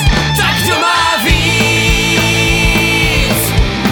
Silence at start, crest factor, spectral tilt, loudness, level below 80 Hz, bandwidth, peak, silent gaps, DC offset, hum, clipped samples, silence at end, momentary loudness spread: 0 s; 12 dB; -3.5 dB/octave; -10 LUFS; -20 dBFS; over 20 kHz; 0 dBFS; none; under 0.1%; none; under 0.1%; 0 s; 2 LU